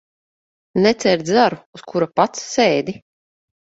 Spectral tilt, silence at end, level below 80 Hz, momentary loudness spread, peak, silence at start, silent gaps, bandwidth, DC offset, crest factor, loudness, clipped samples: -4.5 dB/octave; 0.85 s; -58 dBFS; 12 LU; 0 dBFS; 0.75 s; 1.66-1.73 s; 8 kHz; under 0.1%; 20 dB; -18 LUFS; under 0.1%